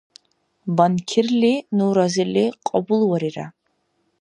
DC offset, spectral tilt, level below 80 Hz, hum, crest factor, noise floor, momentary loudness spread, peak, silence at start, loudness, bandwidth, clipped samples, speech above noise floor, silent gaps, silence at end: under 0.1%; -6 dB/octave; -68 dBFS; none; 18 dB; -69 dBFS; 10 LU; -2 dBFS; 0.65 s; -20 LUFS; 10.5 kHz; under 0.1%; 50 dB; none; 0.7 s